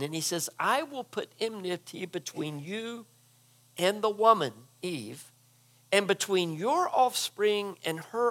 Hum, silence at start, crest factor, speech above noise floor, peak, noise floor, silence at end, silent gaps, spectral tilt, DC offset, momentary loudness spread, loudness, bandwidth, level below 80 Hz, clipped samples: none; 0 s; 22 dB; 33 dB; -8 dBFS; -62 dBFS; 0 s; none; -3.5 dB/octave; under 0.1%; 13 LU; -29 LUFS; 17.5 kHz; -90 dBFS; under 0.1%